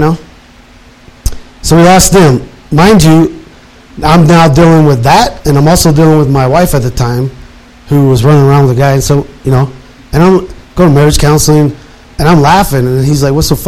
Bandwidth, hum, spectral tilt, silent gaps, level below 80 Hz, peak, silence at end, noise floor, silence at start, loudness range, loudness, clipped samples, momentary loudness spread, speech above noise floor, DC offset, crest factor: 16 kHz; none; -6 dB/octave; none; -22 dBFS; 0 dBFS; 0 s; -36 dBFS; 0 s; 3 LU; -7 LUFS; 1%; 11 LU; 31 dB; 2%; 6 dB